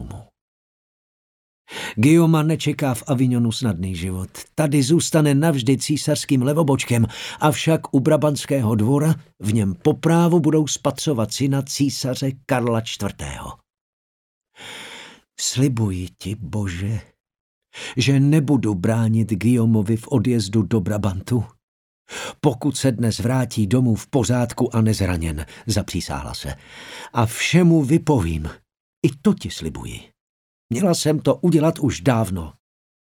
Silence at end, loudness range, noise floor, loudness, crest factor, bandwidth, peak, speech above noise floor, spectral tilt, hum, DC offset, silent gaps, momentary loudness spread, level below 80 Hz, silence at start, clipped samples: 0.5 s; 7 LU; -42 dBFS; -20 LUFS; 18 dB; 17.5 kHz; -2 dBFS; 22 dB; -6 dB/octave; none; under 0.1%; 0.41-1.65 s, 13.81-14.41 s, 17.20-17.24 s, 17.40-17.62 s, 21.63-22.05 s, 28.80-29.02 s, 30.21-30.69 s; 14 LU; -44 dBFS; 0 s; under 0.1%